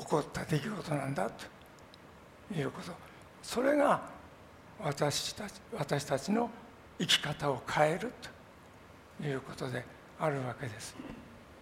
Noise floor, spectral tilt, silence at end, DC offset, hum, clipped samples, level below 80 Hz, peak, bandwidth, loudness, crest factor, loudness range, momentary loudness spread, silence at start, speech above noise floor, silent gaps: -55 dBFS; -4.5 dB/octave; 0 s; under 0.1%; none; under 0.1%; -64 dBFS; -12 dBFS; 16 kHz; -34 LUFS; 24 dB; 6 LU; 25 LU; 0 s; 21 dB; none